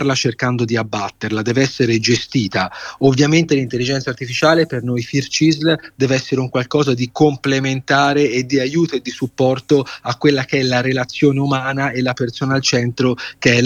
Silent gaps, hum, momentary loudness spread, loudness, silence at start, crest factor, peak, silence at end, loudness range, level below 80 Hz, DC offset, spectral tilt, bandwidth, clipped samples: none; none; 6 LU; -17 LUFS; 0 s; 16 dB; 0 dBFS; 0 s; 1 LU; -52 dBFS; under 0.1%; -5 dB/octave; 10.5 kHz; under 0.1%